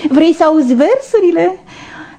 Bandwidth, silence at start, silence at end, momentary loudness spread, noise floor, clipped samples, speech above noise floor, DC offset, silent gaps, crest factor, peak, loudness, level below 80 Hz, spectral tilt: 9.6 kHz; 0 s; 0.15 s; 12 LU; -32 dBFS; under 0.1%; 22 dB; under 0.1%; none; 12 dB; 0 dBFS; -11 LUFS; -52 dBFS; -5.5 dB/octave